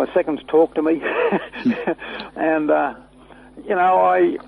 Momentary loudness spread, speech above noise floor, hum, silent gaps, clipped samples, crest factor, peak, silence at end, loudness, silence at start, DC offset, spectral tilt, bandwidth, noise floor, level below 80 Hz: 10 LU; 26 dB; none; none; under 0.1%; 14 dB; -6 dBFS; 0.05 s; -19 LUFS; 0 s; under 0.1%; -7.5 dB/octave; 10.5 kHz; -45 dBFS; -56 dBFS